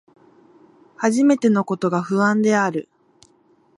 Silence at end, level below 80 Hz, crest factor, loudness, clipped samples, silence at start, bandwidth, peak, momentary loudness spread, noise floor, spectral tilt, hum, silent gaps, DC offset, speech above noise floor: 0.95 s; -70 dBFS; 18 dB; -19 LUFS; under 0.1%; 1 s; 11.5 kHz; -4 dBFS; 7 LU; -58 dBFS; -6 dB/octave; none; none; under 0.1%; 40 dB